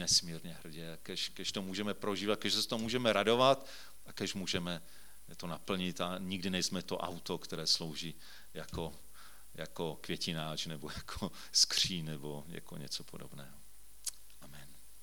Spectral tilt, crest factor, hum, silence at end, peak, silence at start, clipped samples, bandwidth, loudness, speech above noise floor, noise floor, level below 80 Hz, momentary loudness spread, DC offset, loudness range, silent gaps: -3 dB/octave; 26 dB; none; 0 s; -12 dBFS; 0 s; under 0.1%; 19 kHz; -35 LUFS; 21 dB; -58 dBFS; -62 dBFS; 23 LU; 0.4%; 6 LU; none